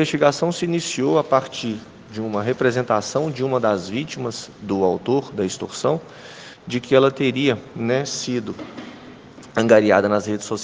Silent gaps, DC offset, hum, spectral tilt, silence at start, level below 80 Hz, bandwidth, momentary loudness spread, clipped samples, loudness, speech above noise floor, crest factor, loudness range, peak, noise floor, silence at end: none; under 0.1%; none; -5 dB/octave; 0 s; -62 dBFS; 10 kHz; 16 LU; under 0.1%; -21 LUFS; 21 dB; 20 dB; 3 LU; 0 dBFS; -41 dBFS; 0 s